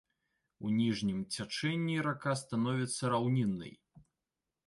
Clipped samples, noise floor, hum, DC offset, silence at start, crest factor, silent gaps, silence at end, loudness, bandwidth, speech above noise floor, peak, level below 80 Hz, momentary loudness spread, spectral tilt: under 0.1%; -90 dBFS; none; under 0.1%; 0.6 s; 16 dB; none; 0.7 s; -34 LUFS; 11.5 kHz; 56 dB; -20 dBFS; -68 dBFS; 7 LU; -5.5 dB/octave